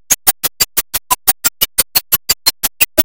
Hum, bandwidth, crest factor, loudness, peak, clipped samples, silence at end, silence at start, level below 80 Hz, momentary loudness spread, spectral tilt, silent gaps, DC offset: none; over 20 kHz; 16 dB; -13 LUFS; 0 dBFS; 0.2%; 0 s; 0.1 s; -42 dBFS; 3 LU; 0.5 dB/octave; none; under 0.1%